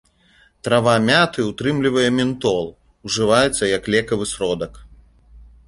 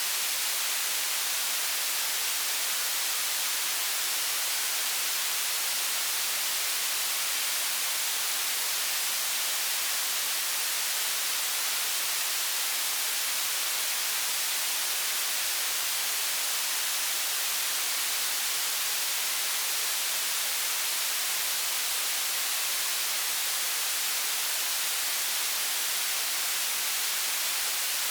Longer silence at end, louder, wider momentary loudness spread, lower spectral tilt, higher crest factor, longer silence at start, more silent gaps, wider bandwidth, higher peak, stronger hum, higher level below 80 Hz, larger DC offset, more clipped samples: first, 0.25 s vs 0 s; first, -18 LUFS vs -26 LUFS; first, 11 LU vs 0 LU; first, -4.5 dB/octave vs 4 dB/octave; about the same, 18 dB vs 14 dB; first, 0.65 s vs 0 s; neither; second, 11.5 kHz vs over 20 kHz; first, -2 dBFS vs -16 dBFS; neither; first, -46 dBFS vs -86 dBFS; neither; neither